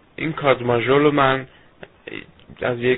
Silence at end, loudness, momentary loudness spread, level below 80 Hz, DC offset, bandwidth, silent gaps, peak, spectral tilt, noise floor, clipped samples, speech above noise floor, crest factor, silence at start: 0 s; -19 LUFS; 19 LU; -50 dBFS; under 0.1%; 4.1 kHz; none; -2 dBFS; -11 dB/octave; -45 dBFS; under 0.1%; 27 dB; 20 dB; 0.2 s